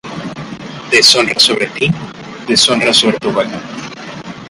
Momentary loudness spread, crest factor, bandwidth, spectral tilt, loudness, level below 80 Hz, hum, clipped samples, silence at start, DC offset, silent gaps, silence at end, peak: 20 LU; 14 dB; 16 kHz; -2.5 dB/octave; -10 LUFS; -48 dBFS; none; 0.1%; 0.05 s; under 0.1%; none; 0 s; 0 dBFS